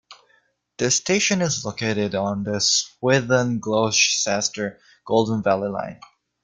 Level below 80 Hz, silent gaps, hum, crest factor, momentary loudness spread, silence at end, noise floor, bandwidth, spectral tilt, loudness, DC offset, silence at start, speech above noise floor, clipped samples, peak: -58 dBFS; none; none; 18 dB; 8 LU; 0.5 s; -63 dBFS; 10.5 kHz; -3 dB/octave; -21 LUFS; under 0.1%; 0.1 s; 42 dB; under 0.1%; -4 dBFS